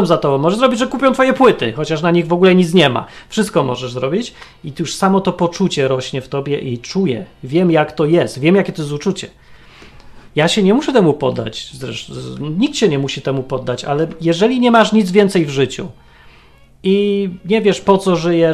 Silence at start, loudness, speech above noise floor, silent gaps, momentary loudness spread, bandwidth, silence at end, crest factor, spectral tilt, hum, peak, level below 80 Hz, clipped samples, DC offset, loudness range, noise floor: 0 s; -15 LUFS; 30 dB; none; 12 LU; 13 kHz; 0 s; 16 dB; -6 dB/octave; none; 0 dBFS; -46 dBFS; under 0.1%; under 0.1%; 4 LU; -45 dBFS